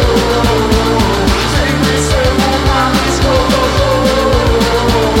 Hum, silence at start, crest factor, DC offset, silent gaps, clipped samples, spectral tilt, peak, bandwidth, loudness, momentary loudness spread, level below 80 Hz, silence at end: none; 0 s; 10 dB; under 0.1%; none; under 0.1%; -5 dB/octave; 0 dBFS; 16.5 kHz; -11 LUFS; 1 LU; -18 dBFS; 0 s